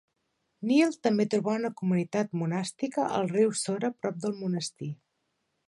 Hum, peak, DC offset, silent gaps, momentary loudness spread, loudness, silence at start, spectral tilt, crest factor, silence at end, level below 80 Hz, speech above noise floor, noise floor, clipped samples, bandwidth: none; -10 dBFS; under 0.1%; none; 9 LU; -29 LUFS; 0.6 s; -5.5 dB/octave; 18 dB; 0.75 s; -76 dBFS; 50 dB; -78 dBFS; under 0.1%; 11.5 kHz